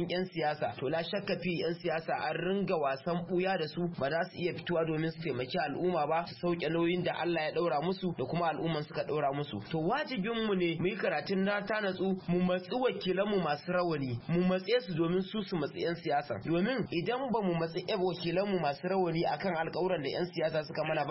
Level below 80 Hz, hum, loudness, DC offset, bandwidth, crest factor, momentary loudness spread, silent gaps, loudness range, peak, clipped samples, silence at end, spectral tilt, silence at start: -62 dBFS; none; -33 LUFS; under 0.1%; 5.8 kHz; 14 dB; 4 LU; none; 1 LU; -18 dBFS; under 0.1%; 0 s; -10 dB/octave; 0 s